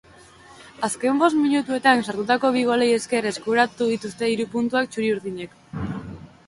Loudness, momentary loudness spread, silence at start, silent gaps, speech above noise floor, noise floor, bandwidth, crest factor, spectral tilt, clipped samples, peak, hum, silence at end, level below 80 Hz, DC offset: -22 LUFS; 13 LU; 0.5 s; none; 27 dB; -48 dBFS; 11.5 kHz; 18 dB; -4.5 dB/octave; under 0.1%; -4 dBFS; none; 0.2 s; -54 dBFS; under 0.1%